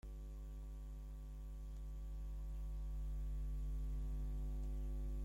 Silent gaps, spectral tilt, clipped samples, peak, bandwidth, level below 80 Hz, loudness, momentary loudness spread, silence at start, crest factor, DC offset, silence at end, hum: none; -8 dB/octave; under 0.1%; -36 dBFS; 7.6 kHz; -44 dBFS; -49 LUFS; 7 LU; 0.05 s; 8 dB; under 0.1%; 0 s; none